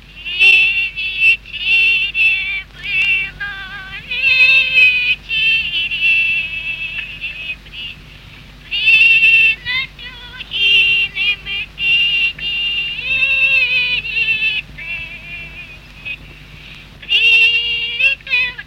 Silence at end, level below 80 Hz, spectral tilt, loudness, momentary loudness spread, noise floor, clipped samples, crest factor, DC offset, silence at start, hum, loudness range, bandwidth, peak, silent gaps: 0.05 s; -42 dBFS; -1.5 dB/octave; -12 LUFS; 19 LU; -38 dBFS; under 0.1%; 16 dB; under 0.1%; 0.1 s; none; 5 LU; 16 kHz; 0 dBFS; none